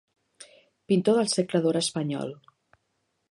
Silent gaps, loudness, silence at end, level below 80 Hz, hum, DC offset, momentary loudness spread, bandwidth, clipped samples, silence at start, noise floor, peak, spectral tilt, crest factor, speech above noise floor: none; -25 LUFS; 0.95 s; -74 dBFS; none; under 0.1%; 10 LU; 11.5 kHz; under 0.1%; 0.4 s; -76 dBFS; -10 dBFS; -5 dB/octave; 18 dB; 51 dB